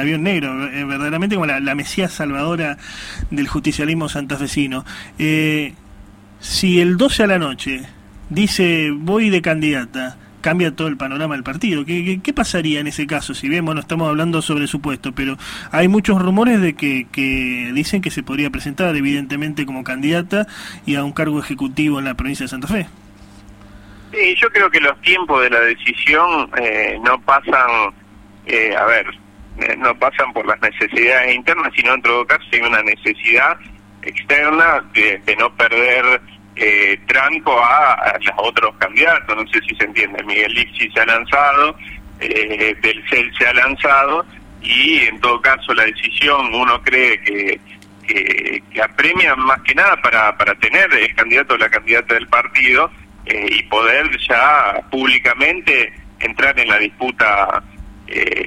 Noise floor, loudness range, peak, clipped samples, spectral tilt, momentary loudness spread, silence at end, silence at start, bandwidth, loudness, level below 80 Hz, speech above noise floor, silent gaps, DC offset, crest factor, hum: -41 dBFS; 8 LU; 0 dBFS; under 0.1%; -4.5 dB/octave; 11 LU; 0 s; 0 s; 16 kHz; -14 LUFS; -42 dBFS; 25 dB; none; under 0.1%; 16 dB; none